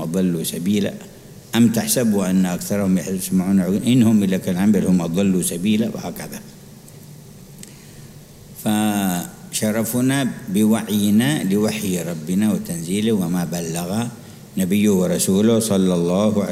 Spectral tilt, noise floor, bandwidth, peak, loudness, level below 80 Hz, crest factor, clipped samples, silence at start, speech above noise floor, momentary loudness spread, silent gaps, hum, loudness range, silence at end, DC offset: -5.5 dB/octave; -41 dBFS; 16 kHz; -2 dBFS; -19 LUFS; -54 dBFS; 16 dB; under 0.1%; 0 s; 23 dB; 12 LU; none; none; 7 LU; 0 s; under 0.1%